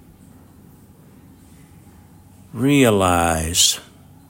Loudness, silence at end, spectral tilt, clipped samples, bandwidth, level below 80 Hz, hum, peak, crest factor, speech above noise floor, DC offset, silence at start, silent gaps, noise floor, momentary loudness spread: -16 LUFS; 0.5 s; -3.5 dB/octave; under 0.1%; 16.5 kHz; -46 dBFS; none; -2 dBFS; 20 dB; 30 dB; under 0.1%; 2.55 s; none; -47 dBFS; 11 LU